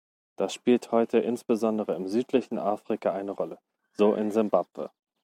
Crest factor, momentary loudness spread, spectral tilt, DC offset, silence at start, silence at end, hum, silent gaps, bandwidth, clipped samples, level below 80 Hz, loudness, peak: 20 dB; 11 LU; -6 dB/octave; under 0.1%; 0.4 s; 0.35 s; none; none; 15.5 kHz; under 0.1%; -76 dBFS; -27 LUFS; -8 dBFS